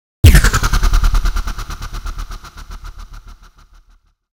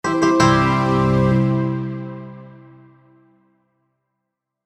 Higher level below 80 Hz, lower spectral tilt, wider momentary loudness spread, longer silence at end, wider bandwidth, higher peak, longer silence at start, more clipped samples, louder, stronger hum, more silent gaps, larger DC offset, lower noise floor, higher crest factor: first, -16 dBFS vs -42 dBFS; second, -4.5 dB/octave vs -6.5 dB/octave; first, 25 LU vs 18 LU; second, 1 s vs 2.15 s; first, 18.5 kHz vs 10 kHz; about the same, 0 dBFS vs -2 dBFS; first, 0.25 s vs 0.05 s; first, 0.5% vs under 0.1%; about the same, -15 LUFS vs -17 LUFS; neither; neither; neither; second, -52 dBFS vs -79 dBFS; about the same, 16 dB vs 18 dB